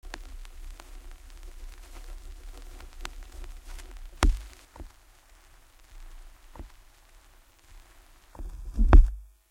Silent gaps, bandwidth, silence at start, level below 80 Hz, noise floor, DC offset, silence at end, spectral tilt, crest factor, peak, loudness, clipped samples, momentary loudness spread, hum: none; 11.5 kHz; 0.1 s; -30 dBFS; -57 dBFS; under 0.1%; 0.3 s; -6 dB/octave; 28 dB; -2 dBFS; -27 LUFS; under 0.1%; 26 LU; none